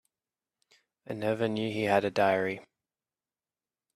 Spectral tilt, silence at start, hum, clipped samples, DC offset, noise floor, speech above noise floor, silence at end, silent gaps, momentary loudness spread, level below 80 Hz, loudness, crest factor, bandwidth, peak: -6 dB/octave; 1.1 s; none; under 0.1%; under 0.1%; under -90 dBFS; over 61 dB; 1.35 s; none; 11 LU; -72 dBFS; -29 LUFS; 20 dB; 13.5 kHz; -12 dBFS